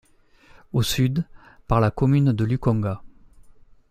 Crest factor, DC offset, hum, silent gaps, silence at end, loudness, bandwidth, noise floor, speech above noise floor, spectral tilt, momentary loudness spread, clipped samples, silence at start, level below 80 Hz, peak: 18 dB; under 0.1%; none; none; 0.85 s; -22 LUFS; 15.5 kHz; -54 dBFS; 34 dB; -6.5 dB/octave; 10 LU; under 0.1%; 0.75 s; -42 dBFS; -6 dBFS